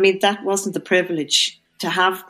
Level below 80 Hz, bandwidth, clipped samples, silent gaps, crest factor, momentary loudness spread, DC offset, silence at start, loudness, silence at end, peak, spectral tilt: -72 dBFS; 15 kHz; under 0.1%; none; 16 dB; 6 LU; under 0.1%; 0 s; -19 LUFS; 0.1 s; -4 dBFS; -2.5 dB/octave